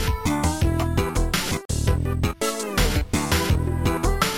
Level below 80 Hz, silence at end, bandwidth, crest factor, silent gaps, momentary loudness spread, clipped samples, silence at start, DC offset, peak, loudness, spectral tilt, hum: -28 dBFS; 0 s; 17 kHz; 14 dB; 1.65-1.69 s; 3 LU; under 0.1%; 0 s; 0.3%; -8 dBFS; -23 LUFS; -4.5 dB/octave; none